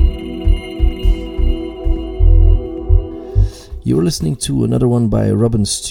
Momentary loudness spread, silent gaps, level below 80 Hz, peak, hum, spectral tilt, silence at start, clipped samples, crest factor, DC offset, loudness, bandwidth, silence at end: 8 LU; none; -16 dBFS; 0 dBFS; none; -6.5 dB/octave; 0 s; under 0.1%; 14 dB; under 0.1%; -17 LUFS; 13.5 kHz; 0 s